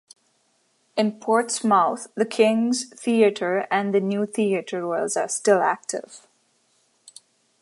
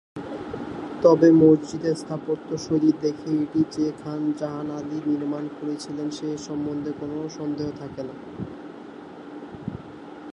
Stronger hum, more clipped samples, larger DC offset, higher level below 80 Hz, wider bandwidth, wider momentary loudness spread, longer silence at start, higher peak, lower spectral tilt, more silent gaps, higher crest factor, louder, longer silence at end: neither; neither; neither; second, -80 dBFS vs -58 dBFS; about the same, 11.5 kHz vs 10.5 kHz; second, 7 LU vs 21 LU; first, 0.95 s vs 0.15 s; about the same, -4 dBFS vs -4 dBFS; second, -4 dB/octave vs -7 dB/octave; neither; about the same, 20 dB vs 20 dB; about the same, -22 LUFS vs -24 LUFS; first, 1.45 s vs 0 s